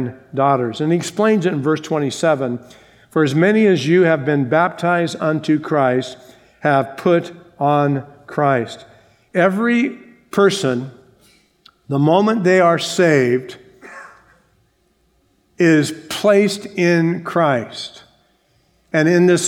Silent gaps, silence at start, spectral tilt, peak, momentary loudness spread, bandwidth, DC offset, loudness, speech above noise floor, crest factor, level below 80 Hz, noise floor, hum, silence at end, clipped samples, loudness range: none; 0 s; -5.5 dB/octave; 0 dBFS; 11 LU; 16.5 kHz; under 0.1%; -17 LUFS; 45 dB; 18 dB; -64 dBFS; -61 dBFS; none; 0 s; under 0.1%; 3 LU